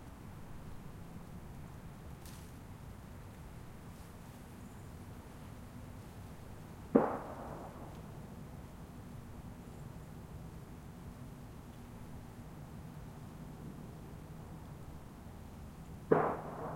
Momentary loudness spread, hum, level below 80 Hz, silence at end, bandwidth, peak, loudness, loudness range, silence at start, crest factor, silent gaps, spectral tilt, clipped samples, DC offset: 14 LU; none; -56 dBFS; 0 s; 16.5 kHz; -10 dBFS; -44 LUFS; 11 LU; 0 s; 32 dB; none; -7.5 dB/octave; under 0.1%; under 0.1%